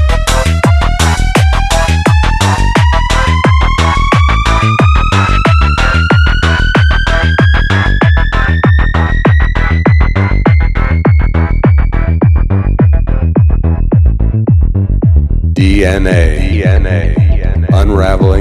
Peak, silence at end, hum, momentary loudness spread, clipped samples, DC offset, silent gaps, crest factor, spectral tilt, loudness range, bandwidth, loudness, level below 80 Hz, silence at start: 0 dBFS; 0 s; none; 2 LU; 0.2%; under 0.1%; none; 8 dB; -6 dB/octave; 1 LU; 12.5 kHz; -10 LUFS; -12 dBFS; 0 s